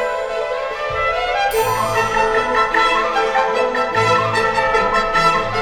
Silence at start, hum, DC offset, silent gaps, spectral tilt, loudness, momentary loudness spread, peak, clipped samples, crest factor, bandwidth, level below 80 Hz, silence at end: 0 s; none; under 0.1%; none; -3.5 dB/octave; -16 LUFS; 7 LU; -2 dBFS; under 0.1%; 14 dB; over 20 kHz; -38 dBFS; 0 s